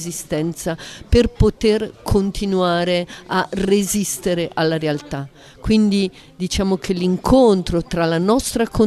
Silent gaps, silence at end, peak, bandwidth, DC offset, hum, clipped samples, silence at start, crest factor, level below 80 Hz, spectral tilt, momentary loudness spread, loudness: none; 0 s; -2 dBFS; 14 kHz; under 0.1%; none; under 0.1%; 0 s; 16 dB; -32 dBFS; -5.5 dB/octave; 10 LU; -19 LUFS